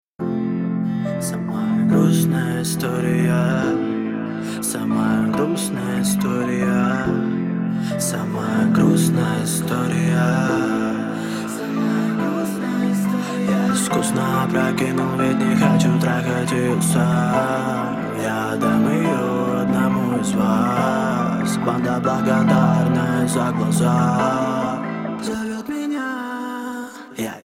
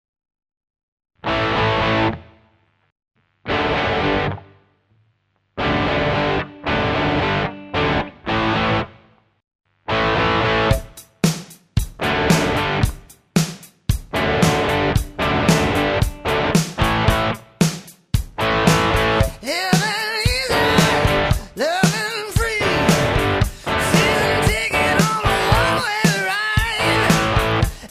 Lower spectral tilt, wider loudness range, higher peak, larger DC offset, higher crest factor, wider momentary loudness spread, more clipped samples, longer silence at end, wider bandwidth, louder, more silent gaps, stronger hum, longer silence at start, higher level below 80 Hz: first, -6 dB/octave vs -4.5 dB/octave; about the same, 3 LU vs 5 LU; about the same, -4 dBFS vs -2 dBFS; neither; about the same, 16 dB vs 18 dB; about the same, 8 LU vs 8 LU; neither; about the same, 0.05 s vs 0.05 s; about the same, 16.5 kHz vs 15.5 kHz; about the same, -20 LUFS vs -18 LUFS; second, none vs 2.92-2.96 s, 9.55-9.59 s; neither; second, 0.2 s vs 1.25 s; second, -52 dBFS vs -32 dBFS